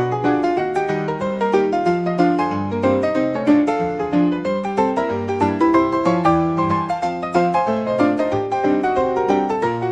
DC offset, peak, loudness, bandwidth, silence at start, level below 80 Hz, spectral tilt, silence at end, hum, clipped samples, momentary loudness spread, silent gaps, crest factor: 0.1%; -4 dBFS; -19 LUFS; 9.6 kHz; 0 s; -52 dBFS; -7.5 dB/octave; 0 s; none; under 0.1%; 5 LU; none; 14 dB